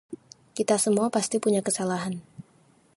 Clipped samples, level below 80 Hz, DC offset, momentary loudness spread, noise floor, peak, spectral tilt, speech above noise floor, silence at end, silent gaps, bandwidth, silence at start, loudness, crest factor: under 0.1%; -70 dBFS; under 0.1%; 17 LU; -60 dBFS; -8 dBFS; -4.5 dB/octave; 35 dB; 0.55 s; none; 12 kHz; 0.1 s; -25 LUFS; 20 dB